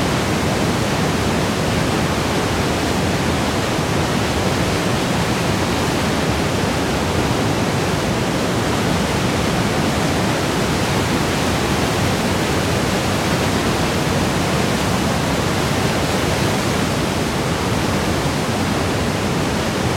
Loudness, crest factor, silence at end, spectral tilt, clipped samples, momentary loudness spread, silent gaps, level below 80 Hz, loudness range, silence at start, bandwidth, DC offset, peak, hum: -18 LUFS; 14 dB; 0 s; -4.5 dB/octave; under 0.1%; 1 LU; none; -34 dBFS; 1 LU; 0 s; 16.5 kHz; under 0.1%; -4 dBFS; none